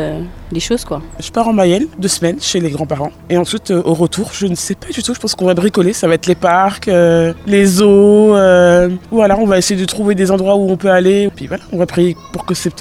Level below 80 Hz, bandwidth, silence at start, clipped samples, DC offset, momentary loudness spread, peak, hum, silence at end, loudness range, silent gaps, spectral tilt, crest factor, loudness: -38 dBFS; 15.5 kHz; 0 s; under 0.1%; 0.1%; 12 LU; 0 dBFS; none; 0 s; 6 LU; none; -5 dB/octave; 12 dB; -12 LUFS